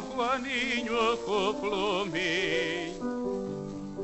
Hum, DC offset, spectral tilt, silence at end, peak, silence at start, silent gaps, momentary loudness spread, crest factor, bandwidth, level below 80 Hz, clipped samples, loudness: none; under 0.1%; -4 dB/octave; 0 s; -14 dBFS; 0 s; none; 7 LU; 16 dB; 8.4 kHz; -56 dBFS; under 0.1%; -30 LUFS